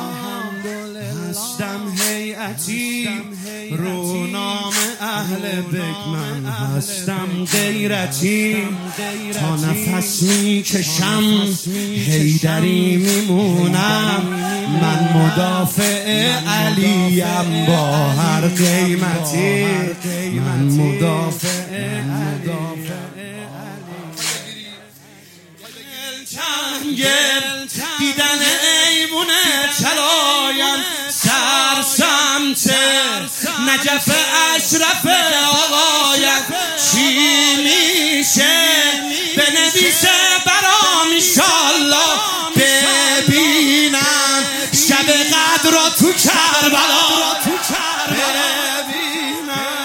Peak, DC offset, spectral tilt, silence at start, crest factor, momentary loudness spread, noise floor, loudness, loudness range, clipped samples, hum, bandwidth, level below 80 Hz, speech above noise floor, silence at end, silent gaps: 0 dBFS; under 0.1%; -2.5 dB/octave; 0 s; 16 dB; 13 LU; -43 dBFS; -14 LUFS; 11 LU; under 0.1%; none; 17 kHz; -60 dBFS; 27 dB; 0 s; none